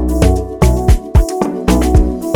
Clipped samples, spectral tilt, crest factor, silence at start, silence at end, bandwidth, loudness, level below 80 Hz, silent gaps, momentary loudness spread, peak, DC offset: under 0.1%; -7 dB/octave; 12 dB; 0 s; 0 s; 18.5 kHz; -13 LUFS; -14 dBFS; none; 3 LU; 0 dBFS; under 0.1%